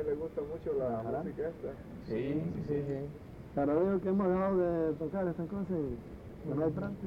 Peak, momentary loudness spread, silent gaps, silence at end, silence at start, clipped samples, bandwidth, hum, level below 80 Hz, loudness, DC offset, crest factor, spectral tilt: -20 dBFS; 14 LU; none; 0 s; 0 s; under 0.1%; 7 kHz; none; -54 dBFS; -34 LUFS; under 0.1%; 14 dB; -10 dB/octave